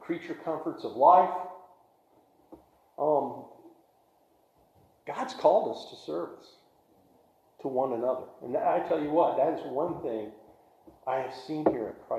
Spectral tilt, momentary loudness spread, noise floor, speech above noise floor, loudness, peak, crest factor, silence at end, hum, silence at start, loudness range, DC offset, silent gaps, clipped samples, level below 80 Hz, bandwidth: -6.5 dB/octave; 16 LU; -67 dBFS; 38 dB; -29 LUFS; -8 dBFS; 24 dB; 0 s; none; 0 s; 8 LU; under 0.1%; none; under 0.1%; -72 dBFS; 13.5 kHz